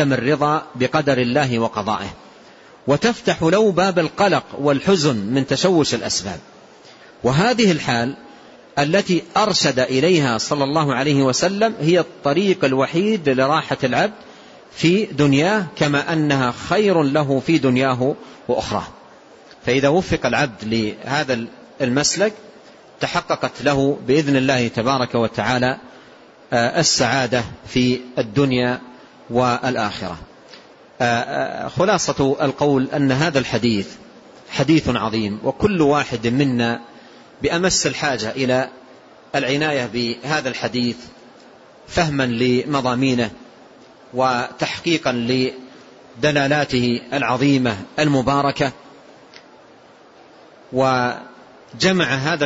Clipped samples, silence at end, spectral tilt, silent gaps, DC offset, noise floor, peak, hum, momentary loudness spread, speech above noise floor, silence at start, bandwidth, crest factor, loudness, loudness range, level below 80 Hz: under 0.1%; 0 s; -5 dB/octave; none; under 0.1%; -47 dBFS; -4 dBFS; none; 8 LU; 29 dB; 0 s; 8 kHz; 16 dB; -19 LUFS; 4 LU; -50 dBFS